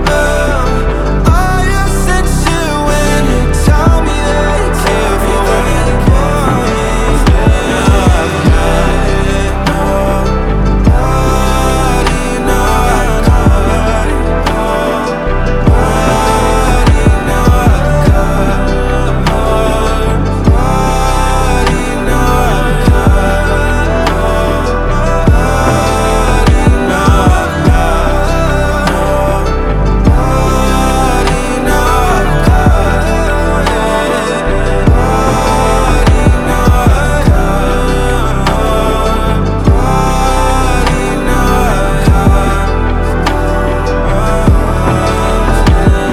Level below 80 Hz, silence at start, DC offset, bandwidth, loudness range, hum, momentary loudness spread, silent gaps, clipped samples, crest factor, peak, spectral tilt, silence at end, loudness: -12 dBFS; 0 s; under 0.1%; 15 kHz; 1 LU; none; 4 LU; none; under 0.1%; 8 dB; 0 dBFS; -6 dB/octave; 0 s; -11 LUFS